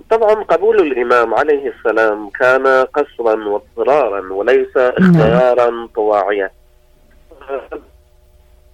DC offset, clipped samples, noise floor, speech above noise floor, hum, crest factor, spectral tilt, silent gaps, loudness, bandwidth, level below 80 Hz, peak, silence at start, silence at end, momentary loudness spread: under 0.1%; under 0.1%; -48 dBFS; 35 dB; none; 12 dB; -8 dB/octave; none; -14 LUFS; 10 kHz; -44 dBFS; -2 dBFS; 0.1 s; 0.95 s; 11 LU